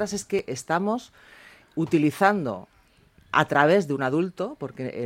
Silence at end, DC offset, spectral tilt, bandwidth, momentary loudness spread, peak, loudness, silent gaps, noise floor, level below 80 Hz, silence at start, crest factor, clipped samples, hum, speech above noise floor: 0 s; under 0.1%; -5.5 dB/octave; 16.5 kHz; 13 LU; -4 dBFS; -24 LUFS; none; -58 dBFS; -64 dBFS; 0 s; 22 dB; under 0.1%; none; 34 dB